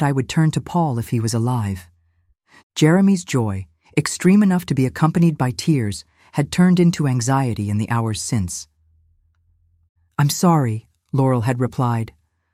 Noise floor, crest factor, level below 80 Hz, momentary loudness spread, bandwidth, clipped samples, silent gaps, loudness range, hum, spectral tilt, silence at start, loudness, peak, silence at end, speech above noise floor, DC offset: -62 dBFS; 16 dB; -52 dBFS; 12 LU; 15.5 kHz; under 0.1%; 2.63-2.70 s, 9.89-9.95 s; 5 LU; none; -6 dB/octave; 0 s; -19 LUFS; -4 dBFS; 0.5 s; 44 dB; under 0.1%